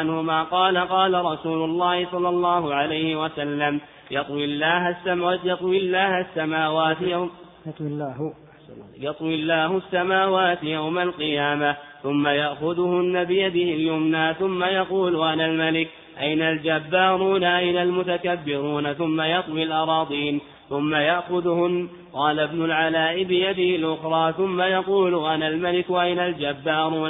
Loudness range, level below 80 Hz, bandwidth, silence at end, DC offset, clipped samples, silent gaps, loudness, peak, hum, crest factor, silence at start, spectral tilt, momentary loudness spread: 2 LU; -62 dBFS; 4 kHz; 0 s; under 0.1%; under 0.1%; none; -22 LUFS; -6 dBFS; none; 16 dB; 0 s; -8.5 dB/octave; 7 LU